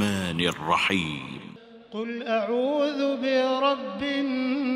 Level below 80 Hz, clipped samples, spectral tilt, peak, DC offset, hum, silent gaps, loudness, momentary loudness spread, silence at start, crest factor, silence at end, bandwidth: -62 dBFS; under 0.1%; -5 dB/octave; -8 dBFS; under 0.1%; none; none; -26 LUFS; 13 LU; 0 s; 18 dB; 0 s; 15.5 kHz